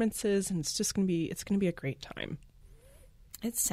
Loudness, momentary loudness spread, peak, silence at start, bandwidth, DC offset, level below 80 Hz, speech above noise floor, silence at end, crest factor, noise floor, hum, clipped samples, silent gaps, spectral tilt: -32 LUFS; 11 LU; -18 dBFS; 0 s; 16 kHz; under 0.1%; -56 dBFS; 25 dB; 0 s; 16 dB; -57 dBFS; none; under 0.1%; none; -4.5 dB/octave